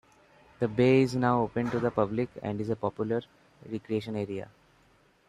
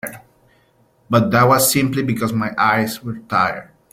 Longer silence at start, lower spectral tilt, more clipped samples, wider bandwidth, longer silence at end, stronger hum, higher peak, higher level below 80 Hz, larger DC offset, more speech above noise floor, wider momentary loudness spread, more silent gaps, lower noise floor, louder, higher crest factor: first, 0.6 s vs 0.05 s; first, -7.5 dB/octave vs -4.5 dB/octave; neither; second, 11.5 kHz vs 16.5 kHz; first, 0.85 s vs 0.3 s; neither; second, -10 dBFS vs -2 dBFS; second, -62 dBFS vs -54 dBFS; neither; second, 35 dB vs 40 dB; about the same, 14 LU vs 12 LU; neither; first, -64 dBFS vs -57 dBFS; second, -29 LUFS vs -17 LUFS; about the same, 20 dB vs 16 dB